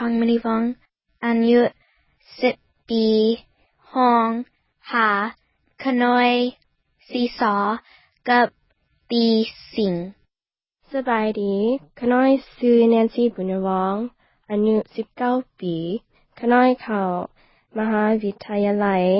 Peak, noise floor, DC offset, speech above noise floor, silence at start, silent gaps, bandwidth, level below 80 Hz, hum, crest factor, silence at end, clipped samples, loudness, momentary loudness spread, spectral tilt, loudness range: -4 dBFS; under -90 dBFS; under 0.1%; over 70 dB; 0 s; none; 5.8 kHz; -60 dBFS; none; 16 dB; 0 s; under 0.1%; -21 LUFS; 12 LU; -10.5 dB/octave; 3 LU